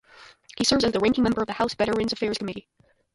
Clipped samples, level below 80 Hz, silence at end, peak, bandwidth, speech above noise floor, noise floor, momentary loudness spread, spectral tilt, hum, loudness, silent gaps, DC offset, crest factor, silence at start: under 0.1%; -52 dBFS; 0.55 s; -6 dBFS; 11.5 kHz; 26 dB; -50 dBFS; 12 LU; -4 dB/octave; none; -24 LUFS; none; under 0.1%; 20 dB; 0.2 s